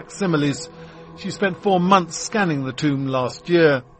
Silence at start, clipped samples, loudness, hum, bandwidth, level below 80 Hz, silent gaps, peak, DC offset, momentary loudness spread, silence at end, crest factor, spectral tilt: 0 s; under 0.1%; -20 LUFS; none; 8.8 kHz; -56 dBFS; none; 0 dBFS; under 0.1%; 16 LU; 0.2 s; 20 dB; -5.5 dB/octave